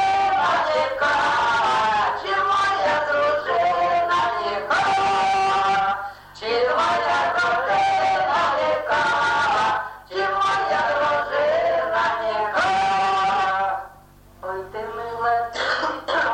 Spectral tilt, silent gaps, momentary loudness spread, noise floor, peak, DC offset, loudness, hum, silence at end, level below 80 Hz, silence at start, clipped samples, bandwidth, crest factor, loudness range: -3 dB/octave; none; 6 LU; -48 dBFS; -10 dBFS; under 0.1%; -21 LUFS; none; 0 s; -54 dBFS; 0 s; under 0.1%; 10.5 kHz; 10 dB; 3 LU